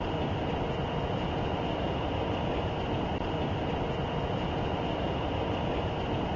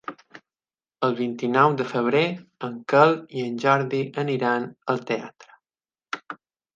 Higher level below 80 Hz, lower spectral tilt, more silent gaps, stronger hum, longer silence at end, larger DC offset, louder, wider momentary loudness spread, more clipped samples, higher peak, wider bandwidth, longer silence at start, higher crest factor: first, -40 dBFS vs -74 dBFS; about the same, -7.5 dB/octave vs -6.5 dB/octave; neither; neither; second, 0 s vs 0.4 s; neither; second, -32 LUFS vs -23 LUFS; second, 1 LU vs 16 LU; neither; second, -18 dBFS vs -2 dBFS; about the same, 7.4 kHz vs 7.6 kHz; about the same, 0 s vs 0.1 s; second, 14 dB vs 22 dB